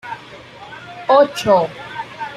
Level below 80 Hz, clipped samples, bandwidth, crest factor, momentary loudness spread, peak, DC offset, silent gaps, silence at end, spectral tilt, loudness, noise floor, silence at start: -56 dBFS; under 0.1%; 14 kHz; 16 dB; 22 LU; -2 dBFS; under 0.1%; none; 0 s; -4.5 dB/octave; -16 LUFS; -38 dBFS; 0.05 s